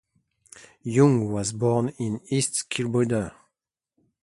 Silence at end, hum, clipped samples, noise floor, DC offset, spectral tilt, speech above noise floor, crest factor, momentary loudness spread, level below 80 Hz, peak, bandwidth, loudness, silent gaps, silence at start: 0.9 s; none; under 0.1%; -84 dBFS; under 0.1%; -5.5 dB/octave; 61 dB; 20 dB; 10 LU; -56 dBFS; -6 dBFS; 11.5 kHz; -24 LUFS; none; 0.85 s